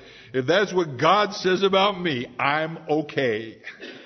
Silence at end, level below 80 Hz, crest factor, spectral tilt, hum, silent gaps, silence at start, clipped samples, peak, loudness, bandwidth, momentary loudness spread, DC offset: 0 s; -64 dBFS; 20 dB; -5 dB/octave; none; none; 0 s; under 0.1%; -4 dBFS; -22 LUFS; 6.4 kHz; 11 LU; under 0.1%